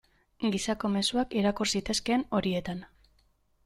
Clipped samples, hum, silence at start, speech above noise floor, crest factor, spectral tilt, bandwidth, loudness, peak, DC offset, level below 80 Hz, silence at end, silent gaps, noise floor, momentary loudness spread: under 0.1%; none; 0.4 s; 39 dB; 18 dB; -4 dB/octave; 14 kHz; -29 LUFS; -14 dBFS; under 0.1%; -54 dBFS; 0.8 s; none; -68 dBFS; 6 LU